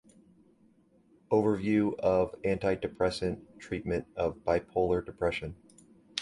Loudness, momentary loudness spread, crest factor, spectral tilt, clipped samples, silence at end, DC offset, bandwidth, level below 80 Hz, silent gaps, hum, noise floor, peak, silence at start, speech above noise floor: -31 LUFS; 10 LU; 22 dB; -6.5 dB/octave; under 0.1%; 0 s; under 0.1%; 11.5 kHz; -52 dBFS; none; none; -64 dBFS; -8 dBFS; 1.3 s; 34 dB